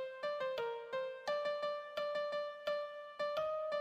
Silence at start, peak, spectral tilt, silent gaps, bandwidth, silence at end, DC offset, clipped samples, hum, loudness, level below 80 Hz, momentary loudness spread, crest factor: 0 s; -26 dBFS; -3 dB/octave; none; 13.5 kHz; 0 s; under 0.1%; under 0.1%; none; -40 LUFS; -82 dBFS; 4 LU; 14 dB